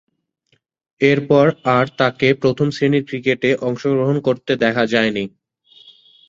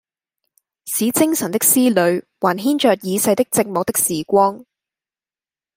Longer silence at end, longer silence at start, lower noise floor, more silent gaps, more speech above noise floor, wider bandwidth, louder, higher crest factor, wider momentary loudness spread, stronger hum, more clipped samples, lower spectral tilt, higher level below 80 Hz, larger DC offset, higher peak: second, 1 s vs 1.15 s; first, 1 s vs 0.85 s; second, -50 dBFS vs under -90 dBFS; neither; second, 34 dB vs over 73 dB; second, 7.6 kHz vs 16.5 kHz; about the same, -17 LUFS vs -17 LUFS; about the same, 18 dB vs 18 dB; about the same, 5 LU vs 6 LU; neither; neither; first, -6.5 dB/octave vs -3.5 dB/octave; first, -56 dBFS vs -62 dBFS; neither; about the same, 0 dBFS vs 0 dBFS